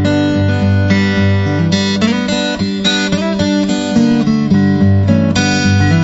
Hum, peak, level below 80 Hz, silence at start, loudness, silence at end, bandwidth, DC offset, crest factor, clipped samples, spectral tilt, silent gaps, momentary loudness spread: none; 0 dBFS; -38 dBFS; 0 s; -13 LUFS; 0 s; 8 kHz; under 0.1%; 12 dB; under 0.1%; -6 dB/octave; none; 3 LU